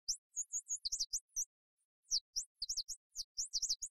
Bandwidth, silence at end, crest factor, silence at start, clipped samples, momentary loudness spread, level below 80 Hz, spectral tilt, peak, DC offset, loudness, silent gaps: 14 kHz; 0 s; 18 dB; 0.1 s; under 0.1%; 7 LU; -68 dBFS; 5 dB/octave; -24 dBFS; under 0.1%; -40 LUFS; 0.18-0.30 s, 1.21-1.28 s, 1.46-1.77 s, 1.85-2.03 s, 2.21-2.33 s, 2.46-2.55 s, 2.96-3.10 s, 3.24-3.35 s